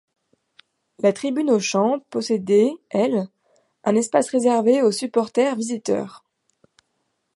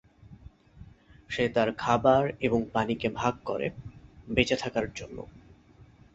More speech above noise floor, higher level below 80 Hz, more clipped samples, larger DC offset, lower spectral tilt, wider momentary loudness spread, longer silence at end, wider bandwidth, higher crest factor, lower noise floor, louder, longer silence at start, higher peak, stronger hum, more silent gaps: first, 53 dB vs 28 dB; second, -74 dBFS vs -52 dBFS; neither; neither; about the same, -5 dB/octave vs -5.5 dB/octave; second, 8 LU vs 18 LU; first, 1.2 s vs 0.75 s; first, 11.5 kHz vs 8 kHz; second, 18 dB vs 24 dB; first, -73 dBFS vs -55 dBFS; first, -21 LUFS vs -28 LUFS; first, 1 s vs 0.3 s; about the same, -4 dBFS vs -6 dBFS; neither; neither